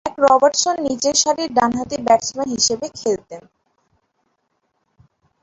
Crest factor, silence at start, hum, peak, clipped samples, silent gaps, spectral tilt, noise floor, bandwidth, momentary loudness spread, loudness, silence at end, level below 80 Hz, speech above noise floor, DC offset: 18 dB; 0.05 s; none; -2 dBFS; under 0.1%; none; -2 dB/octave; -69 dBFS; 8.4 kHz; 10 LU; -17 LUFS; 2 s; -56 dBFS; 52 dB; under 0.1%